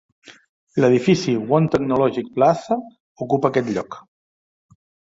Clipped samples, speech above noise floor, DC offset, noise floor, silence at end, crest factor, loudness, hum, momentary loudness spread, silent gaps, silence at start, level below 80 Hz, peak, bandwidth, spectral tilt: under 0.1%; over 71 dB; under 0.1%; under -90 dBFS; 1.05 s; 18 dB; -19 LUFS; none; 10 LU; 0.49-0.67 s, 3.00-3.15 s; 0.3 s; -56 dBFS; -2 dBFS; 7.8 kHz; -7 dB/octave